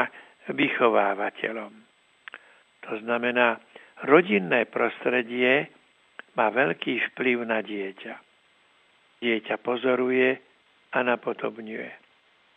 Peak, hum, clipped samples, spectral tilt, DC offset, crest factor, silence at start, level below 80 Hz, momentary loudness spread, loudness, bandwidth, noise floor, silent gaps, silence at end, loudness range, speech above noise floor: -4 dBFS; none; under 0.1%; -7 dB/octave; under 0.1%; 22 dB; 0 s; -88 dBFS; 17 LU; -25 LUFS; 8.4 kHz; -62 dBFS; none; 0.6 s; 5 LU; 37 dB